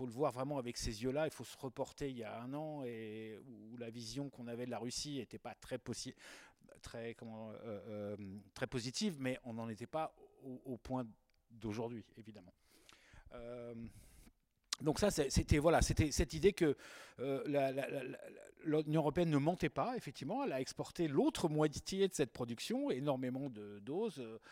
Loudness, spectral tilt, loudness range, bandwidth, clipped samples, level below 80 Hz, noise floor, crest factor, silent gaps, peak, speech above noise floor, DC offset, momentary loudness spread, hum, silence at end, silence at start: -40 LUFS; -5.5 dB/octave; 13 LU; 16 kHz; under 0.1%; -54 dBFS; -69 dBFS; 22 dB; none; -18 dBFS; 30 dB; under 0.1%; 17 LU; none; 0 s; 0 s